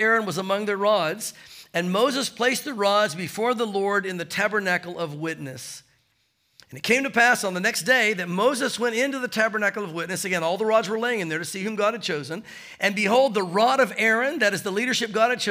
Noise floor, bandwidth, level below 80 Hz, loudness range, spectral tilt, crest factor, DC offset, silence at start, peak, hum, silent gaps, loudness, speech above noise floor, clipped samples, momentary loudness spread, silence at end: -69 dBFS; 16 kHz; -74 dBFS; 4 LU; -3.5 dB/octave; 18 dB; under 0.1%; 0 s; -6 dBFS; none; none; -23 LUFS; 45 dB; under 0.1%; 11 LU; 0 s